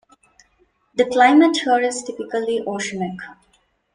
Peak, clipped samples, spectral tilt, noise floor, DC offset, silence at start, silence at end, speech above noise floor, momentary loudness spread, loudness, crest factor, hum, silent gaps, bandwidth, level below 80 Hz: -2 dBFS; under 0.1%; -4 dB/octave; -62 dBFS; under 0.1%; 0.95 s; 0.6 s; 44 dB; 16 LU; -19 LUFS; 18 dB; none; none; 10.5 kHz; -64 dBFS